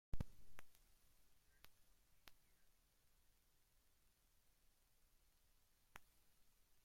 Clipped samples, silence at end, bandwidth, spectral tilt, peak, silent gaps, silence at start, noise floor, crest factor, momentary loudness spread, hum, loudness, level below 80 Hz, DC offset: under 0.1%; 0.35 s; 16.5 kHz; -5.5 dB/octave; -32 dBFS; none; 0.15 s; -77 dBFS; 22 dB; 13 LU; none; -61 LUFS; -64 dBFS; under 0.1%